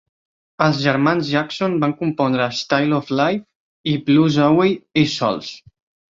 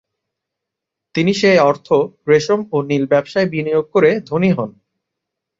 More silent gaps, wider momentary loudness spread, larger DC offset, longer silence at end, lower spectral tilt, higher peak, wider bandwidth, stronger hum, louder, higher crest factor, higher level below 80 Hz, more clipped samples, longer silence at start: first, 3.55-3.84 s vs none; about the same, 7 LU vs 6 LU; neither; second, 0.55 s vs 0.9 s; about the same, -6 dB/octave vs -6 dB/octave; about the same, -2 dBFS vs -2 dBFS; about the same, 7.6 kHz vs 7.8 kHz; neither; about the same, -18 LUFS vs -16 LUFS; about the same, 18 dB vs 16 dB; about the same, -58 dBFS vs -58 dBFS; neither; second, 0.6 s vs 1.15 s